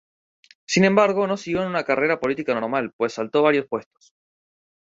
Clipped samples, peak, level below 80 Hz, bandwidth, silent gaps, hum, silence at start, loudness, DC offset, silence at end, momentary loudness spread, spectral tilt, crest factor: under 0.1%; -2 dBFS; -62 dBFS; 7.8 kHz; 2.93-2.99 s; none; 0.7 s; -21 LUFS; under 0.1%; 1.05 s; 9 LU; -5 dB/octave; 20 dB